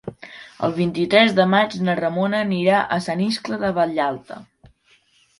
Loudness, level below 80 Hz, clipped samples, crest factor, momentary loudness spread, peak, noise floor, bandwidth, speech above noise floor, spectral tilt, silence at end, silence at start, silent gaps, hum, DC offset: -19 LUFS; -58 dBFS; under 0.1%; 20 dB; 20 LU; -2 dBFS; -59 dBFS; 11.5 kHz; 39 dB; -6 dB/octave; 0.95 s; 0.05 s; none; none; under 0.1%